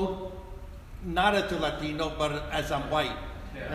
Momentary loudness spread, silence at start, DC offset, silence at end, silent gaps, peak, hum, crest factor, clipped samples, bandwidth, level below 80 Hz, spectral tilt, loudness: 18 LU; 0 s; under 0.1%; 0 s; none; -12 dBFS; none; 18 dB; under 0.1%; 15.5 kHz; -42 dBFS; -5 dB/octave; -29 LUFS